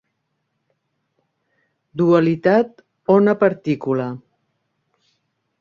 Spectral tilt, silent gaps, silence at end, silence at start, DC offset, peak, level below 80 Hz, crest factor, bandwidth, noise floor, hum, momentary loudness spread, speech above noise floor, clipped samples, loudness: -9 dB/octave; none; 1.45 s; 1.95 s; under 0.1%; -2 dBFS; -64 dBFS; 18 dB; 7 kHz; -73 dBFS; none; 15 LU; 57 dB; under 0.1%; -18 LUFS